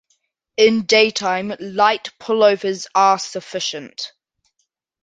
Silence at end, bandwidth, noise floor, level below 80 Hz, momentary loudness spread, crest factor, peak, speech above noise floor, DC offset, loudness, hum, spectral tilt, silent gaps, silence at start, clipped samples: 0.95 s; 9.4 kHz; -72 dBFS; -64 dBFS; 15 LU; 18 dB; -2 dBFS; 54 dB; under 0.1%; -17 LUFS; none; -3 dB/octave; none; 0.6 s; under 0.1%